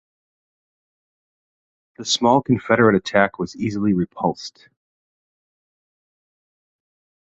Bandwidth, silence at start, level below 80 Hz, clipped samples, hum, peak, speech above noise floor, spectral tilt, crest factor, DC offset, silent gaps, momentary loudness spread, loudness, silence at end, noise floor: 8.2 kHz; 2 s; -56 dBFS; under 0.1%; none; -2 dBFS; over 71 dB; -5 dB/octave; 22 dB; under 0.1%; none; 12 LU; -19 LUFS; 2.75 s; under -90 dBFS